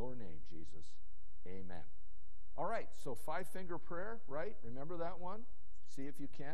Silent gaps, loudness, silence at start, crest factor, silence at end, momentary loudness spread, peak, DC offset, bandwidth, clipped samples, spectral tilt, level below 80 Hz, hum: none; -48 LUFS; 0 s; 20 dB; 0 s; 17 LU; -24 dBFS; 3%; 12.5 kHz; under 0.1%; -6.5 dB/octave; -64 dBFS; none